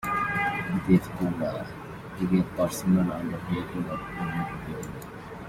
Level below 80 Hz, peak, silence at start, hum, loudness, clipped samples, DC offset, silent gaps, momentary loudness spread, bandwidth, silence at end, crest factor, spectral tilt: -50 dBFS; -8 dBFS; 0 s; none; -28 LUFS; under 0.1%; under 0.1%; none; 15 LU; 15.5 kHz; 0 s; 20 dB; -7 dB/octave